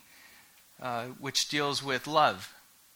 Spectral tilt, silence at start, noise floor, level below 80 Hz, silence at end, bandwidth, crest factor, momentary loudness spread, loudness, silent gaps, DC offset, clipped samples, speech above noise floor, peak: -2.5 dB/octave; 0.25 s; -58 dBFS; -70 dBFS; 0.45 s; over 20 kHz; 22 dB; 15 LU; -29 LUFS; none; under 0.1%; under 0.1%; 28 dB; -12 dBFS